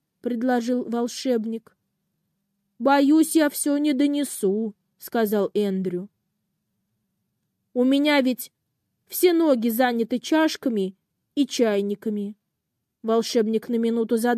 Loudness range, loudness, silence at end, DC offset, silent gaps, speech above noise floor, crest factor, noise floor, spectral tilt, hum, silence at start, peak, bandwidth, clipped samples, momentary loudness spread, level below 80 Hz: 4 LU; -23 LUFS; 0 s; under 0.1%; none; 58 dB; 16 dB; -80 dBFS; -4.5 dB/octave; none; 0.25 s; -8 dBFS; 15.5 kHz; under 0.1%; 13 LU; -76 dBFS